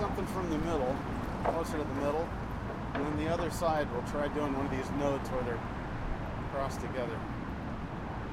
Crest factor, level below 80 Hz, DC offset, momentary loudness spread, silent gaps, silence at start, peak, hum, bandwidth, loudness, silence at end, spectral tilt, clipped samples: 16 dB; -44 dBFS; under 0.1%; 7 LU; none; 0 s; -18 dBFS; none; 16 kHz; -35 LUFS; 0 s; -6.5 dB/octave; under 0.1%